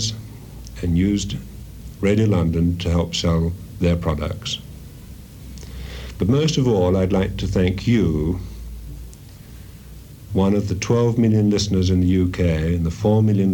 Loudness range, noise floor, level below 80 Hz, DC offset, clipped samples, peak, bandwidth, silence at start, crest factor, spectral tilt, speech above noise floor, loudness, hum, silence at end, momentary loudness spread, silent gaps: 5 LU; -39 dBFS; -34 dBFS; under 0.1%; under 0.1%; -6 dBFS; 19 kHz; 0 s; 14 dB; -6.5 dB/octave; 21 dB; -20 LUFS; none; 0 s; 22 LU; none